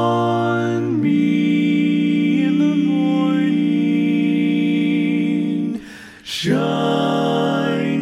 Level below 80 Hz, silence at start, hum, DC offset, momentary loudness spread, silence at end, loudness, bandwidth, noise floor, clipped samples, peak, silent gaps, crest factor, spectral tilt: -62 dBFS; 0 s; none; under 0.1%; 4 LU; 0 s; -18 LUFS; 11 kHz; -37 dBFS; under 0.1%; -6 dBFS; none; 12 dB; -7 dB/octave